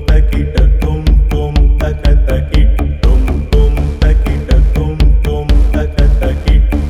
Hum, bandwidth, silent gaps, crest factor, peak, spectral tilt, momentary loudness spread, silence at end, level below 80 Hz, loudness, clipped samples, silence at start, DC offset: none; 7 kHz; none; 8 dB; 0 dBFS; -7.5 dB/octave; 2 LU; 0 s; -10 dBFS; -13 LUFS; under 0.1%; 0 s; under 0.1%